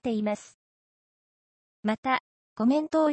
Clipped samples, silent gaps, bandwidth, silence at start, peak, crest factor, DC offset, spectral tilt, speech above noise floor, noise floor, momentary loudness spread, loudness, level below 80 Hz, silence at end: under 0.1%; 0.54-1.83 s, 1.98-2.03 s, 2.20-2.56 s; 8.6 kHz; 0.05 s; -10 dBFS; 18 dB; under 0.1%; -6 dB/octave; over 64 dB; under -90 dBFS; 9 LU; -28 LUFS; -70 dBFS; 0 s